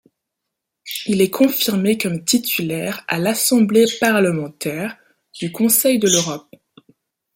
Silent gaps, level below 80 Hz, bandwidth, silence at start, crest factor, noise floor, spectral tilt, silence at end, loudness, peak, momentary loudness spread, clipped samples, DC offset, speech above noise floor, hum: none; -62 dBFS; 17 kHz; 0.85 s; 18 dB; -80 dBFS; -3.5 dB/octave; 0.95 s; -17 LUFS; -2 dBFS; 13 LU; under 0.1%; under 0.1%; 62 dB; none